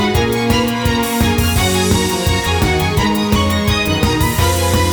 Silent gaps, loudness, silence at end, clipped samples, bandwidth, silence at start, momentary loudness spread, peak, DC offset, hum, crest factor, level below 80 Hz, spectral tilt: none; -15 LUFS; 0 s; under 0.1%; over 20 kHz; 0 s; 1 LU; -2 dBFS; under 0.1%; none; 12 dB; -24 dBFS; -4.5 dB/octave